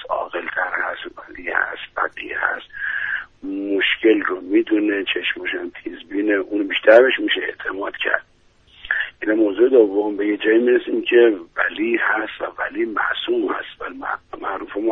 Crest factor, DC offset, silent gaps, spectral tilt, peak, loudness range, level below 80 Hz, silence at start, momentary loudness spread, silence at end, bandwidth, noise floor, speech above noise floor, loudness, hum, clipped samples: 20 dB; under 0.1%; none; -5.5 dB/octave; 0 dBFS; 5 LU; -58 dBFS; 0 s; 13 LU; 0 s; 4.2 kHz; -53 dBFS; 34 dB; -20 LUFS; none; under 0.1%